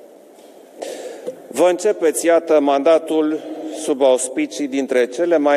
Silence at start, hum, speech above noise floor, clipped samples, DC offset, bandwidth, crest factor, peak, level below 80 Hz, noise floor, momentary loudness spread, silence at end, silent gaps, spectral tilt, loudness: 0.05 s; none; 27 dB; under 0.1%; under 0.1%; 14.5 kHz; 14 dB; -4 dBFS; -88 dBFS; -44 dBFS; 16 LU; 0 s; none; -3 dB/octave; -17 LUFS